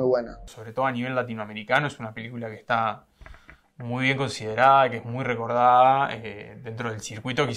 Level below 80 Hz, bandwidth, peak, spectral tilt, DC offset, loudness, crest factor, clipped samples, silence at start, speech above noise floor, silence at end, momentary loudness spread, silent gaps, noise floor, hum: -56 dBFS; 12 kHz; -4 dBFS; -5.5 dB/octave; under 0.1%; -24 LUFS; 22 dB; under 0.1%; 0 s; 25 dB; 0 s; 19 LU; none; -50 dBFS; none